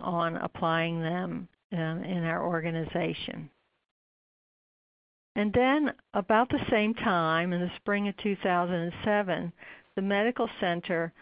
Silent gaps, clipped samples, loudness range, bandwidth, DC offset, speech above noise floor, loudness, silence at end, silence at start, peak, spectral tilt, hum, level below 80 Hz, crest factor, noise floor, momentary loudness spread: 1.64-1.70 s, 3.91-5.35 s; under 0.1%; 7 LU; 5.2 kHz; under 0.1%; over 61 dB; -29 LUFS; 0.1 s; 0 s; -10 dBFS; -10.5 dB/octave; none; -60 dBFS; 20 dB; under -90 dBFS; 11 LU